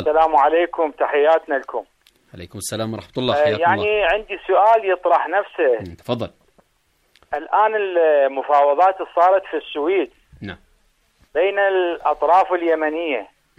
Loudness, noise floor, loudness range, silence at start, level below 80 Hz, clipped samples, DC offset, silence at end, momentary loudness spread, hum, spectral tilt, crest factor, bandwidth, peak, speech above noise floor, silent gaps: -18 LUFS; -64 dBFS; 3 LU; 0 s; -52 dBFS; under 0.1%; under 0.1%; 0.35 s; 13 LU; none; -5 dB/octave; 14 dB; 14.5 kHz; -4 dBFS; 46 dB; none